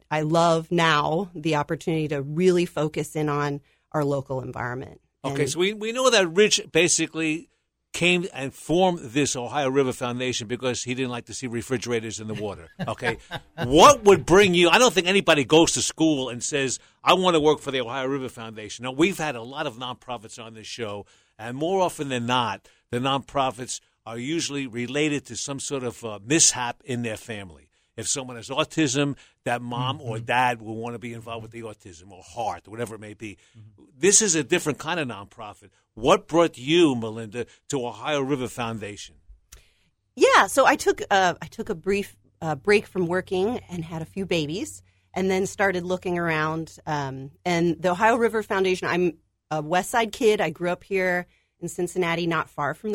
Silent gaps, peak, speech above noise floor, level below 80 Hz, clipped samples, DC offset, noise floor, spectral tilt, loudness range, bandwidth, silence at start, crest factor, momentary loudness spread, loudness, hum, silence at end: none; -2 dBFS; 42 dB; -54 dBFS; under 0.1%; under 0.1%; -66 dBFS; -3.5 dB/octave; 9 LU; 16 kHz; 0.1 s; 22 dB; 17 LU; -23 LUFS; none; 0 s